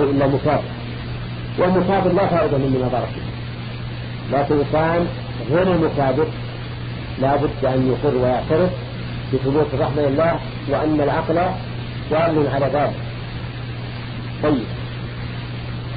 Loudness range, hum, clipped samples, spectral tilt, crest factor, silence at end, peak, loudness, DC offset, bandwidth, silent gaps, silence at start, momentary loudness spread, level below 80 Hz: 2 LU; none; under 0.1%; -11 dB/octave; 16 dB; 0 s; -4 dBFS; -21 LUFS; under 0.1%; 5 kHz; none; 0 s; 12 LU; -38 dBFS